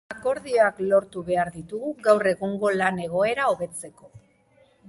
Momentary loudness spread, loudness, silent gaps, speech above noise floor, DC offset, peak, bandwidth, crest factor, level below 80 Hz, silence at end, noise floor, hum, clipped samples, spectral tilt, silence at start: 12 LU; -24 LUFS; none; 36 dB; under 0.1%; -6 dBFS; 11.5 kHz; 20 dB; -62 dBFS; 0.7 s; -60 dBFS; none; under 0.1%; -5 dB/octave; 0.1 s